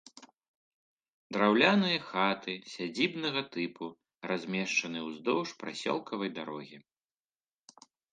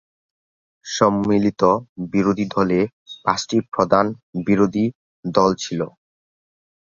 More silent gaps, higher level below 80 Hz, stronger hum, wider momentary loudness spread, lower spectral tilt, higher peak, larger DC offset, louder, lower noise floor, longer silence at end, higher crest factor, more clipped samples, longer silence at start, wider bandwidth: first, 0.48-0.97 s, 1.13-1.30 s vs 1.89-1.96 s, 2.93-3.06 s, 4.23-4.33 s, 4.95-5.23 s; second, -78 dBFS vs -54 dBFS; neither; first, 16 LU vs 10 LU; second, -4.5 dB/octave vs -6 dB/octave; second, -8 dBFS vs -2 dBFS; neither; second, -31 LUFS vs -20 LUFS; about the same, under -90 dBFS vs under -90 dBFS; first, 1.3 s vs 1.05 s; about the same, 24 dB vs 20 dB; neither; second, 0.15 s vs 0.85 s; first, 9.4 kHz vs 7.4 kHz